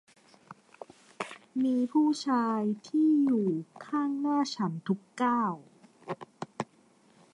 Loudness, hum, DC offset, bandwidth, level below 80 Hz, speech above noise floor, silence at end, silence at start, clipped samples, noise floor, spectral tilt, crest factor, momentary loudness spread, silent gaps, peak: -30 LUFS; none; under 0.1%; 11 kHz; -82 dBFS; 35 dB; 0.7 s; 0.5 s; under 0.1%; -63 dBFS; -6 dB/octave; 16 dB; 18 LU; none; -16 dBFS